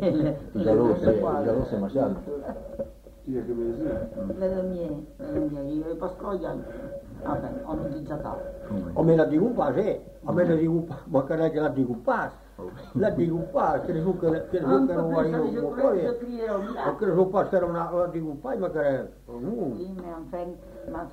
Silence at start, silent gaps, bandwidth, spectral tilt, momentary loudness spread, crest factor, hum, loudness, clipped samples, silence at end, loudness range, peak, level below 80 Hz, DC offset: 0 s; none; 15.5 kHz; -9 dB/octave; 14 LU; 18 dB; none; -27 LUFS; under 0.1%; 0 s; 7 LU; -8 dBFS; -48 dBFS; under 0.1%